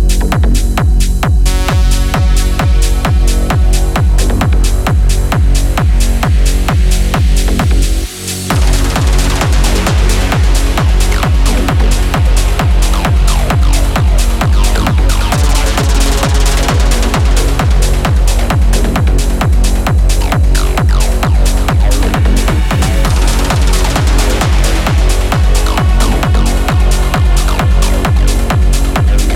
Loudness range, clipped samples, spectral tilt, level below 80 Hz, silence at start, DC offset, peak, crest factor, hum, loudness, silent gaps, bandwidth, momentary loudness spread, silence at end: 1 LU; under 0.1%; -5 dB/octave; -10 dBFS; 0 s; under 0.1%; 0 dBFS; 8 dB; none; -12 LUFS; none; 15.5 kHz; 1 LU; 0 s